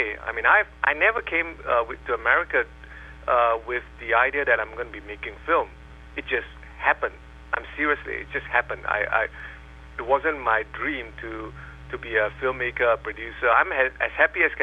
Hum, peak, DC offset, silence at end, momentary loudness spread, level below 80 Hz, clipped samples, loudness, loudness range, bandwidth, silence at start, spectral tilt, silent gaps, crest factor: none; -4 dBFS; under 0.1%; 0 s; 16 LU; -46 dBFS; under 0.1%; -23 LUFS; 4 LU; 8.4 kHz; 0 s; -6 dB/octave; none; 20 dB